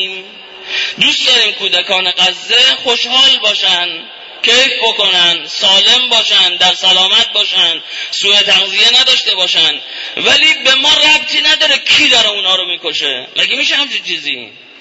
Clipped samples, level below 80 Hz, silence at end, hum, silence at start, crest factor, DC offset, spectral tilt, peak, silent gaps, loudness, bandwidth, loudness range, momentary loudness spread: under 0.1%; -54 dBFS; 0.3 s; none; 0 s; 12 dB; under 0.1%; 0 dB/octave; 0 dBFS; none; -8 LUFS; 11 kHz; 2 LU; 10 LU